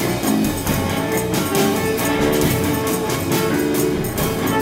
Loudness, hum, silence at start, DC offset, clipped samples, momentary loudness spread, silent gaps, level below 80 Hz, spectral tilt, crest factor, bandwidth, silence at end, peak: -19 LUFS; none; 0 s; under 0.1%; under 0.1%; 3 LU; none; -38 dBFS; -4.5 dB/octave; 14 dB; 16.5 kHz; 0 s; -4 dBFS